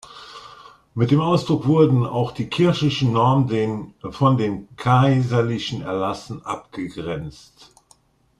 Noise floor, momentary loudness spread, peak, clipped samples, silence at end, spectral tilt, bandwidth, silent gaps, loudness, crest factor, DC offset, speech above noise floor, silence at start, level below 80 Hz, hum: -58 dBFS; 15 LU; -4 dBFS; under 0.1%; 1.1 s; -7.5 dB/octave; 10 kHz; none; -20 LUFS; 18 dB; under 0.1%; 38 dB; 0.1 s; -52 dBFS; none